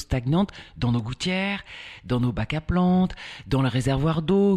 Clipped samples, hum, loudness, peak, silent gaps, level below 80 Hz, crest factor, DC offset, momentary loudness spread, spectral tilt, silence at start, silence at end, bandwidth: under 0.1%; none; -24 LUFS; -10 dBFS; none; -40 dBFS; 14 dB; under 0.1%; 8 LU; -7 dB/octave; 0 s; 0 s; 11 kHz